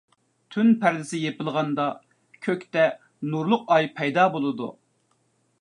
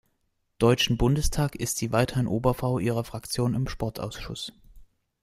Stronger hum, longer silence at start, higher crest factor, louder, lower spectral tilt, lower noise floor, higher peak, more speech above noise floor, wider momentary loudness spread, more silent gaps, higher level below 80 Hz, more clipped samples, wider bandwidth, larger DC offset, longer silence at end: neither; about the same, 0.5 s vs 0.6 s; about the same, 18 dB vs 20 dB; first, -24 LUFS vs -27 LUFS; about the same, -6 dB/octave vs -5 dB/octave; second, -68 dBFS vs -74 dBFS; about the same, -6 dBFS vs -6 dBFS; about the same, 45 dB vs 48 dB; about the same, 13 LU vs 12 LU; neither; second, -78 dBFS vs -40 dBFS; neither; second, 11 kHz vs 16 kHz; neither; first, 0.9 s vs 0.4 s